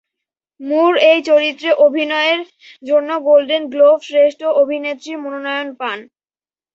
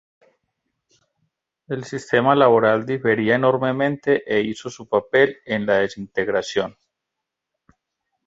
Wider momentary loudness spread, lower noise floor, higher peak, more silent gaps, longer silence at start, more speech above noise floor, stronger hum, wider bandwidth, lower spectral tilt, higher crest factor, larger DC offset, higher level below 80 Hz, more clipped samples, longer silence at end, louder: about the same, 13 LU vs 13 LU; first, under -90 dBFS vs -82 dBFS; about the same, 0 dBFS vs -2 dBFS; neither; second, 0.6 s vs 1.7 s; first, over 75 dB vs 63 dB; neither; about the same, 7.6 kHz vs 8 kHz; second, -2.5 dB/octave vs -6 dB/octave; second, 14 dB vs 20 dB; neither; second, -70 dBFS vs -60 dBFS; neither; second, 0.7 s vs 1.55 s; first, -15 LUFS vs -20 LUFS